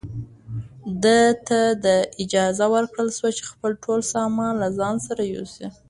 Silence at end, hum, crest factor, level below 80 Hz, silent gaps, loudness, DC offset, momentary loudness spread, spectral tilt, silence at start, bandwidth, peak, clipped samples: 0.2 s; none; 16 dB; -54 dBFS; none; -21 LUFS; under 0.1%; 16 LU; -4.5 dB/octave; 0.05 s; 11.5 kHz; -6 dBFS; under 0.1%